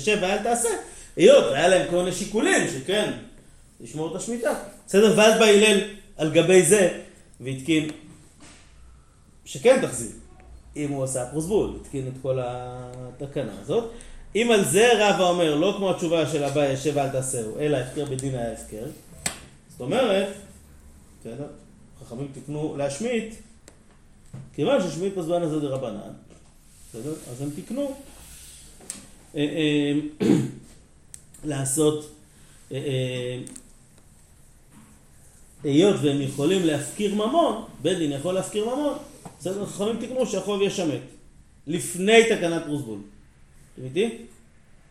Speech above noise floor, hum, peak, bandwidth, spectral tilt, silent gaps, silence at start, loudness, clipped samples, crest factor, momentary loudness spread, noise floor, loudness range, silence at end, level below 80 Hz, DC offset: 30 dB; none; -2 dBFS; 15.5 kHz; -4.5 dB/octave; none; 0 s; -23 LUFS; under 0.1%; 22 dB; 21 LU; -53 dBFS; 10 LU; 0.65 s; -52 dBFS; under 0.1%